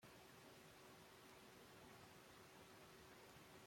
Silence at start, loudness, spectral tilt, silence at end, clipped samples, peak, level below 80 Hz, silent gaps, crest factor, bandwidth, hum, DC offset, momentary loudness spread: 0 s; -64 LUFS; -3.5 dB/octave; 0 s; under 0.1%; -50 dBFS; -84 dBFS; none; 16 dB; 16.5 kHz; none; under 0.1%; 1 LU